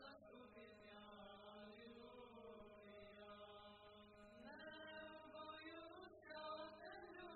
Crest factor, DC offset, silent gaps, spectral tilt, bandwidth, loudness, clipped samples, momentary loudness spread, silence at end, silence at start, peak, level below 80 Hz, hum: 18 dB; under 0.1%; none; -2 dB/octave; 4.3 kHz; -59 LUFS; under 0.1%; 8 LU; 0 s; 0 s; -42 dBFS; -82 dBFS; none